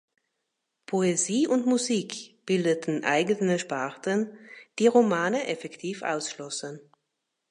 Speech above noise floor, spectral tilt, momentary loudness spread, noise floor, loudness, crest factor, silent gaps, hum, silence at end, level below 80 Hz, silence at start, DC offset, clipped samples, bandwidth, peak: 55 dB; -4.5 dB/octave; 14 LU; -81 dBFS; -26 LUFS; 20 dB; none; none; 0.7 s; -78 dBFS; 0.9 s; under 0.1%; under 0.1%; 11.5 kHz; -8 dBFS